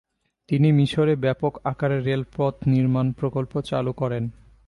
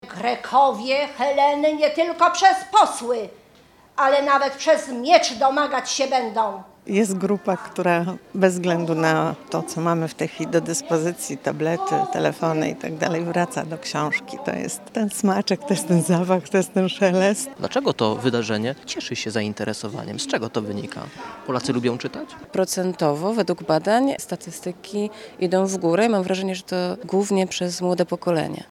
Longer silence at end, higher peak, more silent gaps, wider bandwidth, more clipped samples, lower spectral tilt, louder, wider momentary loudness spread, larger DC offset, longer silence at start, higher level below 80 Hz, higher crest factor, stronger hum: first, 0.35 s vs 0.05 s; second, -10 dBFS vs -2 dBFS; neither; second, 11 kHz vs 16 kHz; neither; first, -8.5 dB/octave vs -4.5 dB/octave; about the same, -23 LUFS vs -22 LUFS; about the same, 8 LU vs 10 LU; neither; first, 0.5 s vs 0.05 s; first, -52 dBFS vs -66 dBFS; second, 14 dB vs 20 dB; neither